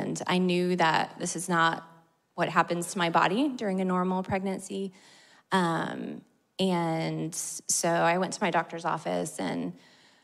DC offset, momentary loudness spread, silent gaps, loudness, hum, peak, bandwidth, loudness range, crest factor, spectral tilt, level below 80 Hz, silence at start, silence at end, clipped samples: under 0.1%; 11 LU; none; -28 LUFS; none; -8 dBFS; 15 kHz; 4 LU; 20 dB; -4 dB/octave; -68 dBFS; 0 s; 0.45 s; under 0.1%